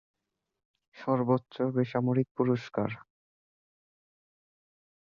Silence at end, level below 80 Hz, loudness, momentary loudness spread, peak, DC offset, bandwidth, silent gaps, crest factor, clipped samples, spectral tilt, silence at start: 2.05 s; -70 dBFS; -30 LUFS; 8 LU; -14 dBFS; under 0.1%; 6.8 kHz; 2.31-2.35 s; 20 dB; under 0.1%; -9 dB/octave; 0.95 s